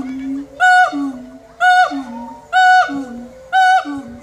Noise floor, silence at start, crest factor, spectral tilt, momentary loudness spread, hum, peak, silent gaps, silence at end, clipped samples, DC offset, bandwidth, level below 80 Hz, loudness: -34 dBFS; 0 s; 14 dB; -2.5 dB/octave; 19 LU; none; -2 dBFS; none; 0 s; under 0.1%; under 0.1%; 11.5 kHz; -54 dBFS; -13 LUFS